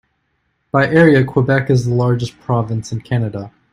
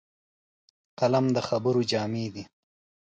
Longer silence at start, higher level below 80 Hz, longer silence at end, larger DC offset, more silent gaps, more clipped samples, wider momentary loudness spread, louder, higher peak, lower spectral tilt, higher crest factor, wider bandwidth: second, 0.75 s vs 1 s; first, -48 dBFS vs -66 dBFS; second, 0.25 s vs 0.7 s; neither; neither; neither; about the same, 11 LU vs 10 LU; first, -15 LUFS vs -27 LUFS; first, 0 dBFS vs -12 dBFS; first, -7.5 dB/octave vs -6 dB/octave; about the same, 16 dB vs 18 dB; first, 10.5 kHz vs 9 kHz